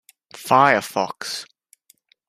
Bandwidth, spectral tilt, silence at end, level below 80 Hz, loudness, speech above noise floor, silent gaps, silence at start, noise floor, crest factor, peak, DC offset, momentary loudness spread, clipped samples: 15.5 kHz; -3.5 dB/octave; 0.85 s; -66 dBFS; -19 LUFS; 40 dB; none; 0.35 s; -59 dBFS; 20 dB; -2 dBFS; under 0.1%; 16 LU; under 0.1%